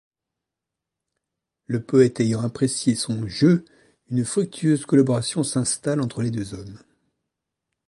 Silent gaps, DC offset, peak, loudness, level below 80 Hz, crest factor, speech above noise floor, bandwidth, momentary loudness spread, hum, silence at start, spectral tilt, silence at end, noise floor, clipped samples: none; under 0.1%; -4 dBFS; -22 LUFS; -58 dBFS; 20 dB; 64 dB; 11.5 kHz; 11 LU; none; 1.7 s; -5.5 dB/octave; 1.1 s; -85 dBFS; under 0.1%